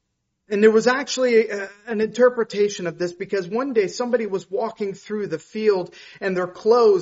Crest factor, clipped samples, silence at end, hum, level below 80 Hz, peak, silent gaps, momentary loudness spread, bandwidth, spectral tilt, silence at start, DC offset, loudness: 18 dB; under 0.1%; 0 s; none; -68 dBFS; -2 dBFS; none; 12 LU; 8 kHz; -3.5 dB/octave; 0.5 s; under 0.1%; -21 LUFS